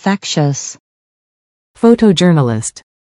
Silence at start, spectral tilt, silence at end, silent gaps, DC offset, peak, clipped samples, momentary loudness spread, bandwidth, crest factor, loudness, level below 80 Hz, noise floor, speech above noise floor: 0.05 s; -5.5 dB/octave; 0.4 s; 0.80-1.74 s; under 0.1%; 0 dBFS; 0.3%; 13 LU; 11.5 kHz; 14 dB; -12 LUFS; -50 dBFS; under -90 dBFS; over 78 dB